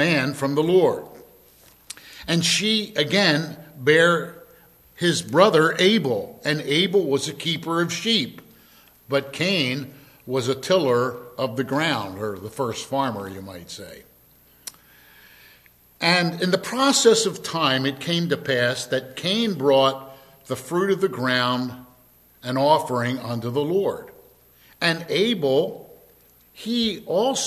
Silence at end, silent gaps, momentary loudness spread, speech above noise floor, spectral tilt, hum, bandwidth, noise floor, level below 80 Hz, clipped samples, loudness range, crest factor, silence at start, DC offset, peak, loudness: 0 s; none; 16 LU; 33 dB; -4 dB/octave; none; 14.5 kHz; -55 dBFS; -62 dBFS; under 0.1%; 7 LU; 22 dB; 0 s; under 0.1%; -2 dBFS; -21 LUFS